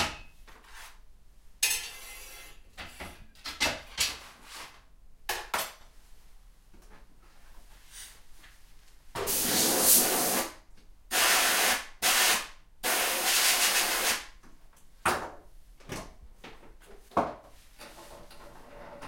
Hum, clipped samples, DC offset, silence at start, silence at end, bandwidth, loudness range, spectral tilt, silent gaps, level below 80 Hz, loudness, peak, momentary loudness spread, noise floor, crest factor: none; under 0.1%; under 0.1%; 0 s; 0 s; 16.5 kHz; 16 LU; 0 dB/octave; none; -54 dBFS; -26 LUFS; -8 dBFS; 25 LU; -53 dBFS; 26 dB